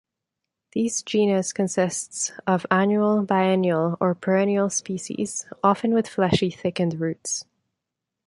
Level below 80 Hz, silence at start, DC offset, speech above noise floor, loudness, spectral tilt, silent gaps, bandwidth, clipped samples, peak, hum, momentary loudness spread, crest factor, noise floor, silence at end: -58 dBFS; 0.75 s; under 0.1%; 61 dB; -23 LUFS; -5 dB/octave; none; 11.5 kHz; under 0.1%; -4 dBFS; none; 8 LU; 20 dB; -84 dBFS; 0.85 s